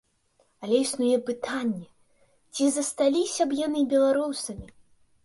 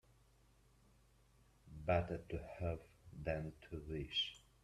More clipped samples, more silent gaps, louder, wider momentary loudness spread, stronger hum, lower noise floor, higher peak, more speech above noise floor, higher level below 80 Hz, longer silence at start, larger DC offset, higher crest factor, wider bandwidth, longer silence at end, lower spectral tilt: neither; neither; first, -26 LUFS vs -43 LUFS; about the same, 14 LU vs 12 LU; neither; second, -67 dBFS vs -71 dBFS; first, -10 dBFS vs -22 dBFS; first, 42 dB vs 28 dB; about the same, -60 dBFS vs -60 dBFS; second, 0.6 s vs 1.65 s; neither; second, 16 dB vs 22 dB; about the same, 11.5 kHz vs 12.5 kHz; first, 0.55 s vs 0.25 s; second, -3.5 dB/octave vs -6 dB/octave